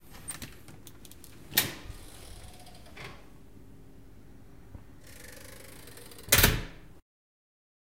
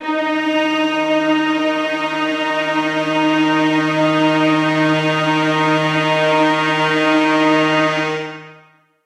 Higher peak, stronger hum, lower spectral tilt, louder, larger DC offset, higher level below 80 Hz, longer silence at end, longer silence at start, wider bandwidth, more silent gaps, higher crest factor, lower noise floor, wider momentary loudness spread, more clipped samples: about the same, -4 dBFS vs -4 dBFS; neither; second, -2 dB/octave vs -5.5 dB/octave; second, -27 LUFS vs -16 LUFS; first, 0.3% vs under 0.1%; first, -46 dBFS vs -68 dBFS; first, 1.2 s vs 0.5 s; about the same, 0.1 s vs 0 s; first, 17 kHz vs 11 kHz; neither; first, 30 dB vs 12 dB; about the same, -53 dBFS vs -50 dBFS; first, 27 LU vs 5 LU; neither